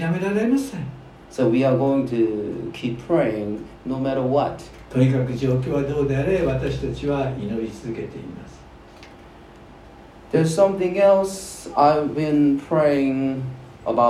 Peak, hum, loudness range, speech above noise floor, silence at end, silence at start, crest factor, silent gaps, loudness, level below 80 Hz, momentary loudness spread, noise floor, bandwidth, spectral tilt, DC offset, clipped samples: -4 dBFS; none; 9 LU; 23 dB; 0 s; 0 s; 18 dB; none; -21 LUFS; -46 dBFS; 14 LU; -44 dBFS; 14 kHz; -7.5 dB/octave; under 0.1%; under 0.1%